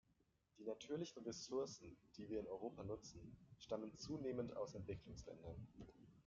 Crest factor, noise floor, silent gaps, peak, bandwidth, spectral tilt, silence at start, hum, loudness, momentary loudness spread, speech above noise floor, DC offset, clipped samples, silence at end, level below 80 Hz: 18 dB; -82 dBFS; none; -32 dBFS; 7.4 kHz; -6 dB/octave; 0.55 s; none; -51 LUFS; 14 LU; 31 dB; under 0.1%; under 0.1%; 0.05 s; -72 dBFS